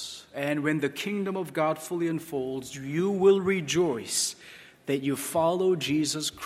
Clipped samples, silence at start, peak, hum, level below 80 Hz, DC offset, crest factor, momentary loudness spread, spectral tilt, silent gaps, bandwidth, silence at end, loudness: under 0.1%; 0 s; -10 dBFS; none; -66 dBFS; under 0.1%; 18 dB; 10 LU; -4 dB/octave; none; 16 kHz; 0 s; -27 LUFS